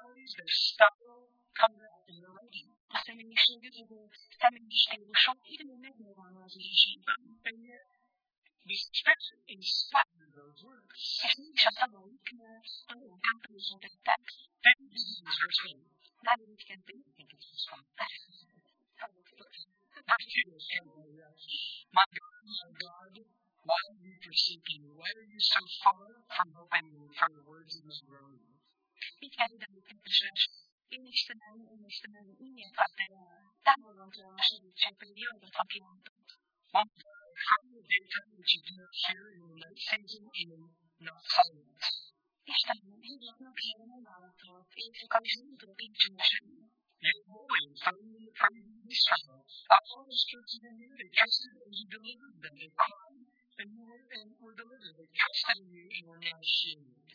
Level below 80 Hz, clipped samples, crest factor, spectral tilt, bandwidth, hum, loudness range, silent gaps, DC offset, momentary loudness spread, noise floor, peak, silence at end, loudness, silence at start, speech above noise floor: under -90 dBFS; under 0.1%; 30 dB; -1 dB/octave; 5.4 kHz; none; 7 LU; 0.94-0.99 s, 2.80-2.88 s, 8.38-8.42 s, 22.06-22.11 s, 30.72-30.78 s, 36.09-36.16 s; under 0.1%; 22 LU; -72 dBFS; -4 dBFS; 0.4 s; -30 LUFS; 0.25 s; 38 dB